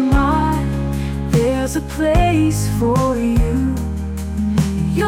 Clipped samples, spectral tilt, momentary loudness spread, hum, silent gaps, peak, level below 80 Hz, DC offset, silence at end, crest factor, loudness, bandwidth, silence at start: under 0.1%; -6.5 dB/octave; 7 LU; none; none; -4 dBFS; -24 dBFS; under 0.1%; 0 s; 12 dB; -18 LUFS; 17 kHz; 0 s